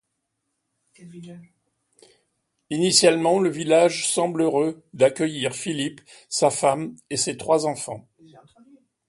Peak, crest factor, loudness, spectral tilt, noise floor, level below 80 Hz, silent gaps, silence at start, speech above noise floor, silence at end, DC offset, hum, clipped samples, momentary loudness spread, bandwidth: -2 dBFS; 22 dB; -22 LUFS; -3.5 dB/octave; -77 dBFS; -68 dBFS; none; 1 s; 55 dB; 1.1 s; under 0.1%; none; under 0.1%; 14 LU; 11.5 kHz